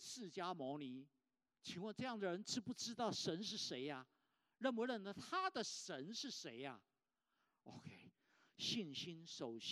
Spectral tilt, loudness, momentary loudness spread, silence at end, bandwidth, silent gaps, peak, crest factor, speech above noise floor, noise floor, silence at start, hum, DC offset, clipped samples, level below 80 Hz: -3.5 dB/octave; -47 LUFS; 14 LU; 0 s; 13.5 kHz; none; -26 dBFS; 22 dB; 43 dB; -90 dBFS; 0 s; none; under 0.1%; under 0.1%; under -90 dBFS